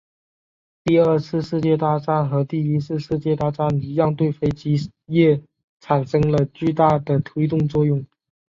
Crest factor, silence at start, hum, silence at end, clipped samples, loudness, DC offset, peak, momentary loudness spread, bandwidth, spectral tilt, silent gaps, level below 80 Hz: 16 dB; 0.85 s; none; 0.45 s; under 0.1%; -20 LUFS; under 0.1%; -4 dBFS; 6 LU; 7.4 kHz; -9 dB/octave; 5.64-5.77 s; -50 dBFS